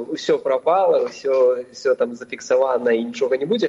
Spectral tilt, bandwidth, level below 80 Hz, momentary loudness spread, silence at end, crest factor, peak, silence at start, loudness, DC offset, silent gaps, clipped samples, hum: -4.5 dB/octave; 7.8 kHz; -72 dBFS; 5 LU; 0 s; 14 dB; -6 dBFS; 0 s; -20 LUFS; under 0.1%; none; under 0.1%; none